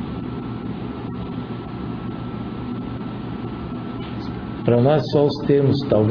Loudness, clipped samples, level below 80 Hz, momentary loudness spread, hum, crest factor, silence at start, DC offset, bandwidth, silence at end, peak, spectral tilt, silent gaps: -23 LUFS; under 0.1%; -42 dBFS; 12 LU; none; 20 dB; 0 s; under 0.1%; 5.4 kHz; 0 s; -2 dBFS; -9.5 dB/octave; none